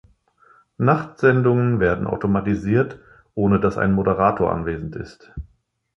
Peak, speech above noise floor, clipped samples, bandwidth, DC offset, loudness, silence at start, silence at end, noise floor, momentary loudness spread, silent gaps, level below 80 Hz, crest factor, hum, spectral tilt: -2 dBFS; 36 dB; under 0.1%; 6.8 kHz; under 0.1%; -20 LUFS; 0.8 s; 0.55 s; -56 dBFS; 16 LU; none; -42 dBFS; 18 dB; none; -9.5 dB/octave